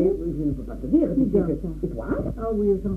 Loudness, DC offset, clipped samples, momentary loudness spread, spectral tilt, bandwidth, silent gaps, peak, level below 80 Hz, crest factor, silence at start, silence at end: -24 LUFS; under 0.1%; under 0.1%; 8 LU; -11 dB/octave; 6.4 kHz; none; -8 dBFS; -36 dBFS; 16 dB; 0 s; 0 s